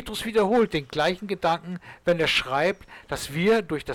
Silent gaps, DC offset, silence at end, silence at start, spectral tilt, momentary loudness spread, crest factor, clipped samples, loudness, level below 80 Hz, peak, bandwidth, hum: none; under 0.1%; 0 s; 0 s; -4.5 dB/octave; 10 LU; 12 dB; under 0.1%; -24 LUFS; -50 dBFS; -14 dBFS; 17.5 kHz; none